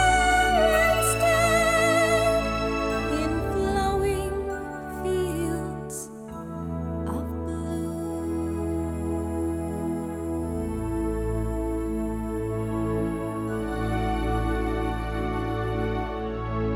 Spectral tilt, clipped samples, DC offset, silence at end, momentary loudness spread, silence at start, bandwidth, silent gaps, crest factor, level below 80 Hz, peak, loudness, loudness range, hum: -5 dB/octave; under 0.1%; under 0.1%; 0 s; 11 LU; 0 s; 19 kHz; none; 18 dB; -36 dBFS; -8 dBFS; -26 LUFS; 8 LU; none